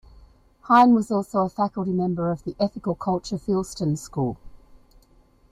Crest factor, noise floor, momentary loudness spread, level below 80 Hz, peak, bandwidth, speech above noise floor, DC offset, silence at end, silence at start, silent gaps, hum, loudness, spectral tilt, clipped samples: 20 dB; -57 dBFS; 11 LU; -52 dBFS; -4 dBFS; 14 kHz; 34 dB; under 0.1%; 0.95 s; 0.65 s; none; none; -23 LUFS; -7 dB/octave; under 0.1%